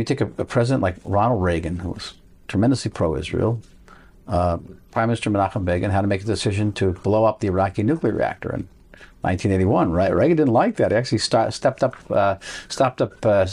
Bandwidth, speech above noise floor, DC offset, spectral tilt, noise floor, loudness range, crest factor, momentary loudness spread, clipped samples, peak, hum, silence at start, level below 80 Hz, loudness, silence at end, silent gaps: 11 kHz; 27 dB; under 0.1%; -6.5 dB/octave; -47 dBFS; 4 LU; 14 dB; 10 LU; under 0.1%; -6 dBFS; none; 0 s; -44 dBFS; -21 LUFS; 0 s; none